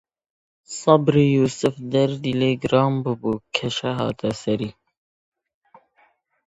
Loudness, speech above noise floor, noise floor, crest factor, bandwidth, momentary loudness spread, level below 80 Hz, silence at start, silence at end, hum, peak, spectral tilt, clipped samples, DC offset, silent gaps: -21 LUFS; 41 dB; -62 dBFS; 22 dB; 9 kHz; 9 LU; -56 dBFS; 0.7 s; 1.75 s; none; 0 dBFS; -6 dB/octave; under 0.1%; under 0.1%; none